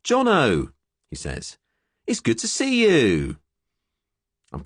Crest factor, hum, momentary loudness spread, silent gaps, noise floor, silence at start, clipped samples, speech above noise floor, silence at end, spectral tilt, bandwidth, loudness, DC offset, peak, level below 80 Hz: 16 dB; none; 21 LU; none; -83 dBFS; 0.05 s; under 0.1%; 62 dB; 0 s; -4.5 dB/octave; 11 kHz; -20 LUFS; under 0.1%; -8 dBFS; -44 dBFS